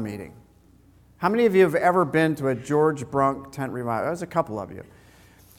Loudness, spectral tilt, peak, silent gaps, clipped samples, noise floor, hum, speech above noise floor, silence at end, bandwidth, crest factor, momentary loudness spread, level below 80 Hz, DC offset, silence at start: -23 LUFS; -7 dB/octave; -6 dBFS; none; under 0.1%; -55 dBFS; none; 32 dB; 0.75 s; 16.5 kHz; 18 dB; 16 LU; -58 dBFS; under 0.1%; 0 s